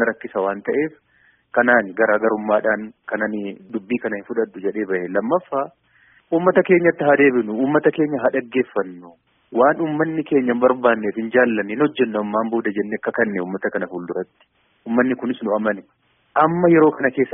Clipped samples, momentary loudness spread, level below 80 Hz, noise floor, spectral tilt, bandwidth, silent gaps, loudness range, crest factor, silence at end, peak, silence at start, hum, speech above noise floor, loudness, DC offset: under 0.1%; 11 LU; -64 dBFS; -56 dBFS; -1.5 dB/octave; 3.7 kHz; none; 5 LU; 18 dB; 0 s; -2 dBFS; 0 s; none; 37 dB; -19 LUFS; under 0.1%